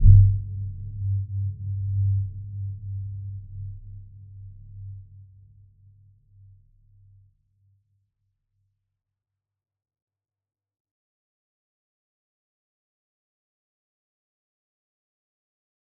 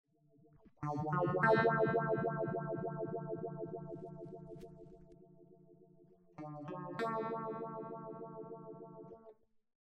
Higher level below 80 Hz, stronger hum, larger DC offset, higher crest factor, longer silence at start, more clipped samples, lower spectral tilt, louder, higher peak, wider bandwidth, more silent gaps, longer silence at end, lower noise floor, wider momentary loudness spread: first, -34 dBFS vs -74 dBFS; neither; neither; about the same, 26 dB vs 22 dB; second, 0 s vs 0.8 s; neither; first, -17.5 dB/octave vs -8.5 dB/octave; first, -26 LUFS vs -38 LUFS; first, -2 dBFS vs -18 dBFS; second, 0.5 kHz vs 8.6 kHz; neither; first, 10.75 s vs 0.55 s; first, -87 dBFS vs -68 dBFS; about the same, 21 LU vs 22 LU